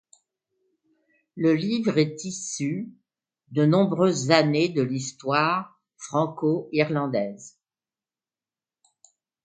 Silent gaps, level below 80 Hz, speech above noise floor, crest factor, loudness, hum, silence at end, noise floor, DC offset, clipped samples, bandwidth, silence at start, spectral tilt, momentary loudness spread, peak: none; -70 dBFS; over 67 dB; 24 dB; -24 LUFS; none; 1.95 s; under -90 dBFS; under 0.1%; under 0.1%; 9.4 kHz; 1.35 s; -5.5 dB/octave; 12 LU; -2 dBFS